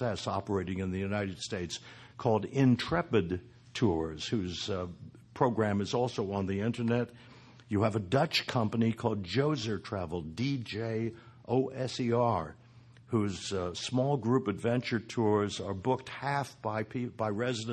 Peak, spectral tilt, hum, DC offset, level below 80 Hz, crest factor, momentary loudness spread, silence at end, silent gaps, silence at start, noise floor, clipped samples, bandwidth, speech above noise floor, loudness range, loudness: -12 dBFS; -6 dB/octave; none; under 0.1%; -54 dBFS; 20 dB; 8 LU; 0 s; none; 0 s; -56 dBFS; under 0.1%; 12.5 kHz; 24 dB; 2 LU; -32 LUFS